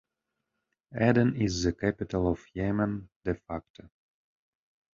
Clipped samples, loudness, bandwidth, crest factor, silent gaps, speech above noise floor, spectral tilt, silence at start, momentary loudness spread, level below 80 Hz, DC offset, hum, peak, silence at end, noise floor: under 0.1%; -29 LUFS; 7.6 kHz; 22 dB; 3.16-3.21 s, 3.70-3.74 s; 56 dB; -6.5 dB/octave; 0.9 s; 12 LU; -48 dBFS; under 0.1%; none; -10 dBFS; 1.1 s; -85 dBFS